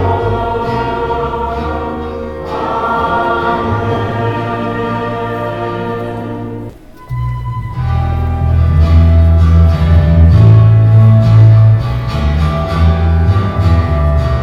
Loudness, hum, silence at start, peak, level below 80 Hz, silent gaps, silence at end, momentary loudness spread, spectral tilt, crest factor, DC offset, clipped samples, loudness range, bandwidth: -12 LUFS; none; 0 s; 0 dBFS; -18 dBFS; none; 0 s; 14 LU; -9 dB/octave; 10 dB; under 0.1%; under 0.1%; 11 LU; 5.8 kHz